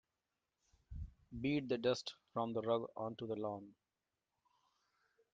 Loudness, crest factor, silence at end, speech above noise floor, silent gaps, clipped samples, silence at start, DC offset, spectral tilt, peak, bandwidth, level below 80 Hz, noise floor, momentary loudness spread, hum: -41 LUFS; 20 dB; 1.6 s; over 50 dB; none; under 0.1%; 0.9 s; under 0.1%; -5 dB/octave; -22 dBFS; 7.4 kHz; -64 dBFS; under -90 dBFS; 15 LU; none